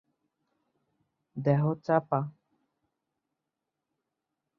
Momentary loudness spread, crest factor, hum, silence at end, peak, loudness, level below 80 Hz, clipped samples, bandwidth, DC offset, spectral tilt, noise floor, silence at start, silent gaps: 12 LU; 24 dB; none; 2.3 s; -10 dBFS; -29 LUFS; -74 dBFS; under 0.1%; 6.2 kHz; under 0.1%; -10.5 dB/octave; -86 dBFS; 1.35 s; none